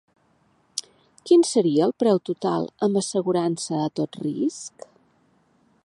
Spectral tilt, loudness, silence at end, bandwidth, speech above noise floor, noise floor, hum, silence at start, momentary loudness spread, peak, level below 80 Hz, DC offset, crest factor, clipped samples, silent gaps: -5.5 dB/octave; -23 LUFS; 1.15 s; 11.5 kHz; 41 dB; -63 dBFS; none; 0.75 s; 15 LU; -6 dBFS; -72 dBFS; under 0.1%; 18 dB; under 0.1%; none